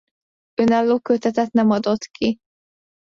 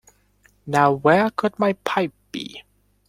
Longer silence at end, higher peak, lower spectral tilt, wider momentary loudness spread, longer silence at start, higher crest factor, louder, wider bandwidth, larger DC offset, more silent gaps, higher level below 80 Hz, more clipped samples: first, 0.7 s vs 0.5 s; second, -6 dBFS vs -2 dBFS; about the same, -6 dB/octave vs -6 dB/octave; second, 6 LU vs 15 LU; about the same, 0.6 s vs 0.65 s; second, 14 dB vs 20 dB; about the same, -20 LUFS vs -20 LUFS; second, 7.4 kHz vs 16 kHz; neither; neither; about the same, -58 dBFS vs -60 dBFS; neither